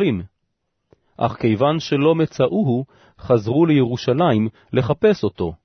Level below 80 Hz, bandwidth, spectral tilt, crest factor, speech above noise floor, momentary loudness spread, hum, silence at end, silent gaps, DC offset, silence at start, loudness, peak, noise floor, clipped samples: -50 dBFS; 6.4 kHz; -8 dB/octave; 16 dB; 55 dB; 8 LU; none; 0.1 s; none; under 0.1%; 0 s; -19 LUFS; -4 dBFS; -73 dBFS; under 0.1%